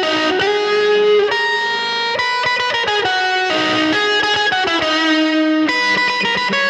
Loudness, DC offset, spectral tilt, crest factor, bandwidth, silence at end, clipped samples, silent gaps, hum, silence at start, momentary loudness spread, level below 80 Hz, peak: -15 LUFS; under 0.1%; -3 dB/octave; 12 dB; 11 kHz; 0 s; under 0.1%; none; none; 0 s; 2 LU; -56 dBFS; -4 dBFS